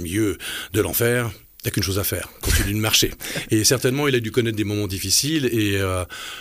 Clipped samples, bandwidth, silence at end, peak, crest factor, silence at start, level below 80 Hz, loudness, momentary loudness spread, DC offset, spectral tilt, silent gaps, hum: under 0.1%; 16 kHz; 0 s; -4 dBFS; 16 dB; 0 s; -36 dBFS; -21 LUFS; 9 LU; under 0.1%; -3.5 dB/octave; none; none